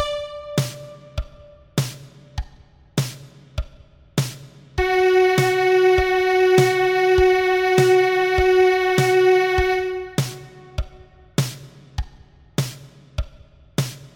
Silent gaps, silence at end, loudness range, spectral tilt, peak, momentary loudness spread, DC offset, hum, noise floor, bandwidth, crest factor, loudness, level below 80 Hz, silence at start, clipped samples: none; 0.1 s; 14 LU; -5.5 dB/octave; -4 dBFS; 19 LU; under 0.1%; none; -49 dBFS; 17.5 kHz; 16 dB; -19 LUFS; -36 dBFS; 0 s; under 0.1%